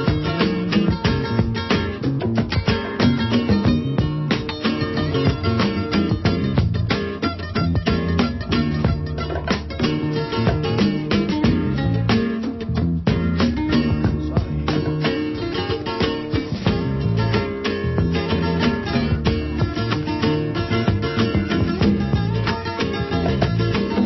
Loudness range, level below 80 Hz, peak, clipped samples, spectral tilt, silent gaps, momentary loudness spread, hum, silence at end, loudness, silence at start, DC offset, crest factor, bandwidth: 2 LU; -32 dBFS; -4 dBFS; under 0.1%; -7.5 dB/octave; none; 4 LU; none; 0 s; -21 LUFS; 0 s; under 0.1%; 16 dB; 6 kHz